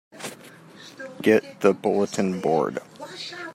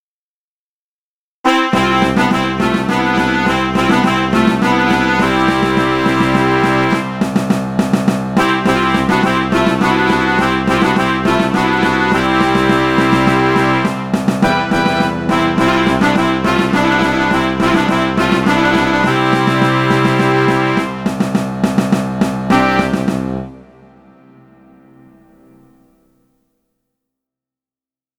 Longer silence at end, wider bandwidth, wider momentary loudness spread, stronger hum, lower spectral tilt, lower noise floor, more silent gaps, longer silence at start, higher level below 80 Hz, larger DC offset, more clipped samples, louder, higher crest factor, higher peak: second, 0 s vs 4.55 s; about the same, 15.5 kHz vs 16 kHz; first, 19 LU vs 4 LU; neither; about the same, -5.5 dB/octave vs -6 dB/octave; second, -46 dBFS vs under -90 dBFS; neither; second, 0.15 s vs 1.45 s; second, -72 dBFS vs -38 dBFS; neither; neither; second, -23 LUFS vs -13 LUFS; first, 20 dB vs 14 dB; second, -4 dBFS vs 0 dBFS